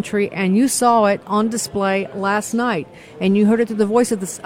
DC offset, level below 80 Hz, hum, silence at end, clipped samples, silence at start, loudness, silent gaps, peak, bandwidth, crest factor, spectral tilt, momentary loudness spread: under 0.1%; -56 dBFS; none; 0 s; under 0.1%; 0 s; -18 LUFS; none; -2 dBFS; 16.5 kHz; 16 dB; -5 dB/octave; 7 LU